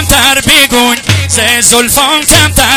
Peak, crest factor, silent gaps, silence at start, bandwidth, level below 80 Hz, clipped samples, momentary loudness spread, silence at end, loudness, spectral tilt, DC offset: 0 dBFS; 8 dB; none; 0 s; over 20 kHz; -24 dBFS; 4%; 4 LU; 0 s; -5 LUFS; -2 dB/octave; under 0.1%